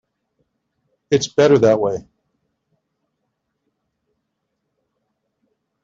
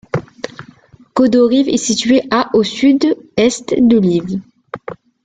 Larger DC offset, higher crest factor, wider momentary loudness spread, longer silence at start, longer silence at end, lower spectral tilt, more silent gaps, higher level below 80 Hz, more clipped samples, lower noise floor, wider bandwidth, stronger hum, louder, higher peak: neither; first, 20 dB vs 14 dB; second, 10 LU vs 18 LU; first, 1.1 s vs 0.15 s; first, 3.85 s vs 0.3 s; about the same, -5.5 dB/octave vs -5 dB/octave; neither; second, -60 dBFS vs -50 dBFS; neither; first, -75 dBFS vs -44 dBFS; second, 7.6 kHz vs 9.4 kHz; neither; about the same, -16 LUFS vs -14 LUFS; about the same, -2 dBFS vs -2 dBFS